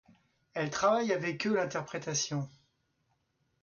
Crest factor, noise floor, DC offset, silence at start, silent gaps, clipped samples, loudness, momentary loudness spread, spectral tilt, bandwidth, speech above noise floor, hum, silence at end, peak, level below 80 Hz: 18 dB; -77 dBFS; under 0.1%; 0.55 s; none; under 0.1%; -32 LUFS; 10 LU; -4 dB/octave; 7.4 kHz; 45 dB; none; 1.15 s; -16 dBFS; -72 dBFS